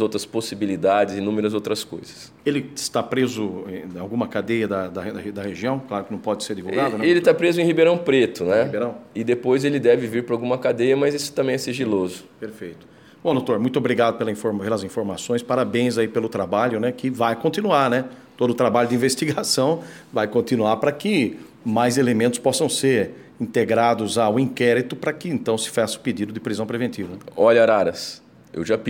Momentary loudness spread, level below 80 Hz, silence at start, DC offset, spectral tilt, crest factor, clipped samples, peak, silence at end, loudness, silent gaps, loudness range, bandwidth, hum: 11 LU; -64 dBFS; 0 s; under 0.1%; -5 dB/octave; 18 dB; under 0.1%; -4 dBFS; 0 s; -21 LUFS; none; 6 LU; 17 kHz; none